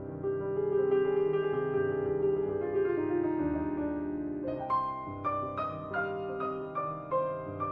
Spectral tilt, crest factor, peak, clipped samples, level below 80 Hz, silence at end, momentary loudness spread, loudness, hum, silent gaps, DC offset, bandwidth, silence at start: -10.5 dB/octave; 14 dB; -18 dBFS; under 0.1%; -58 dBFS; 0 s; 7 LU; -32 LUFS; none; none; under 0.1%; 4.5 kHz; 0 s